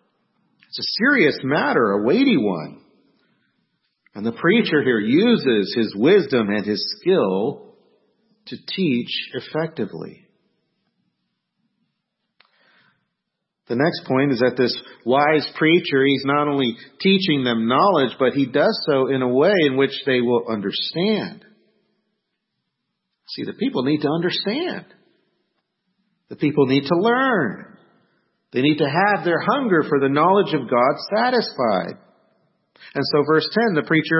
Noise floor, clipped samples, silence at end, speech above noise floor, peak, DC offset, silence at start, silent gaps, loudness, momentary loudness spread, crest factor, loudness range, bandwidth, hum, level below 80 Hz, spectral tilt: -79 dBFS; under 0.1%; 0 s; 60 dB; -4 dBFS; under 0.1%; 0.75 s; none; -19 LUFS; 11 LU; 16 dB; 9 LU; 6 kHz; none; -68 dBFS; -9 dB/octave